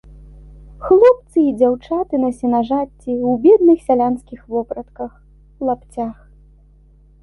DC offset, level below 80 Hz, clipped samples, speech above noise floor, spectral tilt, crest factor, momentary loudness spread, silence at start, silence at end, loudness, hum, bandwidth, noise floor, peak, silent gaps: under 0.1%; -44 dBFS; under 0.1%; 32 dB; -8 dB/octave; 16 dB; 17 LU; 0.8 s; 1.1 s; -16 LUFS; 50 Hz at -45 dBFS; 11.5 kHz; -48 dBFS; 0 dBFS; none